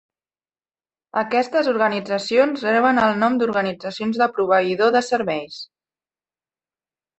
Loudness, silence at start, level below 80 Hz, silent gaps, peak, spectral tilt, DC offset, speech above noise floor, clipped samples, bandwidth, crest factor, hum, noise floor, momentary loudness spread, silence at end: -19 LUFS; 1.15 s; -64 dBFS; none; -4 dBFS; -5 dB/octave; under 0.1%; over 71 dB; under 0.1%; 8.4 kHz; 18 dB; none; under -90 dBFS; 10 LU; 1.55 s